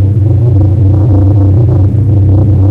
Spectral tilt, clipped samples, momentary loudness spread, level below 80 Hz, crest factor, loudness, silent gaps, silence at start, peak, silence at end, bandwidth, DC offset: -12 dB/octave; under 0.1%; 1 LU; -22 dBFS; 2 dB; -8 LUFS; none; 0 s; -4 dBFS; 0 s; 1.7 kHz; under 0.1%